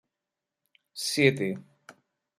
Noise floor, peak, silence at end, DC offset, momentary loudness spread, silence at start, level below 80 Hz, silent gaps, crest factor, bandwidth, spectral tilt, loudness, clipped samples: -88 dBFS; -8 dBFS; 0.5 s; under 0.1%; 18 LU; 0.95 s; -70 dBFS; none; 24 dB; 15 kHz; -4.5 dB/octave; -26 LUFS; under 0.1%